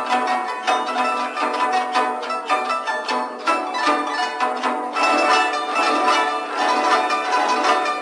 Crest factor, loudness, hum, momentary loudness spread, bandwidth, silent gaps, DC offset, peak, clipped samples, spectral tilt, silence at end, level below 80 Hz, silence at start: 16 dB; -20 LUFS; none; 5 LU; 11 kHz; none; under 0.1%; -4 dBFS; under 0.1%; -0.5 dB/octave; 0 s; -84 dBFS; 0 s